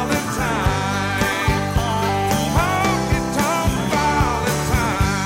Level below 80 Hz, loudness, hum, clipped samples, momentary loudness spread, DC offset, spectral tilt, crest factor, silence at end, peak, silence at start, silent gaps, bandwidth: -30 dBFS; -19 LUFS; none; under 0.1%; 2 LU; under 0.1%; -4.5 dB/octave; 10 dB; 0 s; -8 dBFS; 0 s; none; 16 kHz